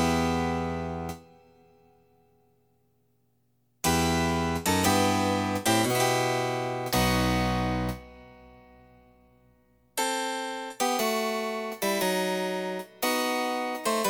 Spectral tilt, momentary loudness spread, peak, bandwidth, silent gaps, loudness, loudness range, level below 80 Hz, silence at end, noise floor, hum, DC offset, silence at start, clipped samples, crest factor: -4 dB/octave; 9 LU; -10 dBFS; over 20 kHz; none; -27 LUFS; 9 LU; -46 dBFS; 0 s; -71 dBFS; 60 Hz at -65 dBFS; under 0.1%; 0 s; under 0.1%; 18 dB